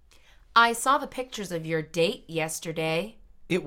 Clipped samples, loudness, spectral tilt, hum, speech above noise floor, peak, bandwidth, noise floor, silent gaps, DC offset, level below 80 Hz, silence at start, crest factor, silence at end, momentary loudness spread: under 0.1%; -26 LUFS; -3.5 dB/octave; none; 27 dB; -6 dBFS; 17 kHz; -55 dBFS; none; under 0.1%; -56 dBFS; 0.55 s; 22 dB; 0 s; 12 LU